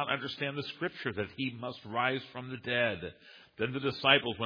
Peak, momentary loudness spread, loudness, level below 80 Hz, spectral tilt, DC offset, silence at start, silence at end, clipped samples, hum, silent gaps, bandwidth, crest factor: -8 dBFS; 15 LU; -32 LUFS; -68 dBFS; -6.5 dB/octave; under 0.1%; 0 s; 0 s; under 0.1%; none; none; 5.2 kHz; 24 dB